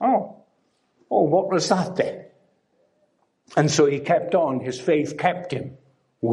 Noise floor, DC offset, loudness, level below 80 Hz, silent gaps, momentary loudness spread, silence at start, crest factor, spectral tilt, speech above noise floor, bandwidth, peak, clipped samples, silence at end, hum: -67 dBFS; under 0.1%; -22 LUFS; -68 dBFS; none; 12 LU; 0 s; 20 dB; -5.5 dB/octave; 46 dB; 11.5 kHz; -4 dBFS; under 0.1%; 0 s; none